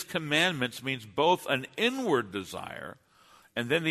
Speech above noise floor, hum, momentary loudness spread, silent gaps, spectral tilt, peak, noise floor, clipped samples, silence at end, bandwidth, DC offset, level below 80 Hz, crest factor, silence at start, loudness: 30 dB; none; 14 LU; none; -4 dB/octave; -12 dBFS; -60 dBFS; under 0.1%; 0 s; 13.5 kHz; under 0.1%; -70 dBFS; 18 dB; 0 s; -29 LUFS